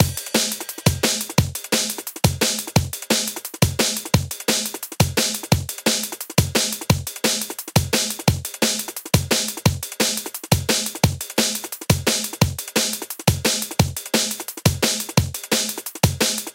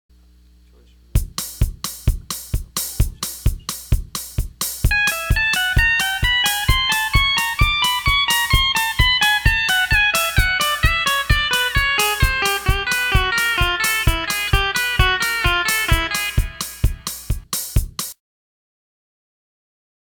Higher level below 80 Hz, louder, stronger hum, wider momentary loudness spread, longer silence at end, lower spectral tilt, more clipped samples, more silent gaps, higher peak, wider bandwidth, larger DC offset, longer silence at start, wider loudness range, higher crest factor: second, -40 dBFS vs -24 dBFS; second, -21 LUFS vs -18 LUFS; neither; second, 3 LU vs 9 LU; second, 0 s vs 2 s; about the same, -3.5 dB/octave vs -2.5 dB/octave; neither; neither; about the same, 0 dBFS vs -2 dBFS; second, 17 kHz vs 19.5 kHz; neither; second, 0 s vs 1.15 s; second, 1 LU vs 9 LU; about the same, 22 dB vs 18 dB